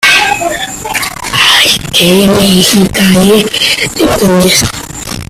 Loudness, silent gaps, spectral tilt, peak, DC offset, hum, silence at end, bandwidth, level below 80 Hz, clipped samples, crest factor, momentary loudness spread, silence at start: -7 LUFS; none; -3.5 dB/octave; 0 dBFS; under 0.1%; none; 0.05 s; 16.5 kHz; -32 dBFS; 0.5%; 8 dB; 9 LU; 0 s